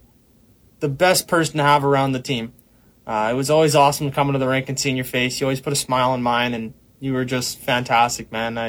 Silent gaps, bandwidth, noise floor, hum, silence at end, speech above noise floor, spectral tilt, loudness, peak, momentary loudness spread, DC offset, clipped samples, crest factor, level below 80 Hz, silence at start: none; 19.5 kHz; -54 dBFS; none; 0 s; 35 dB; -4 dB/octave; -19 LUFS; -4 dBFS; 11 LU; under 0.1%; under 0.1%; 16 dB; -52 dBFS; 0.8 s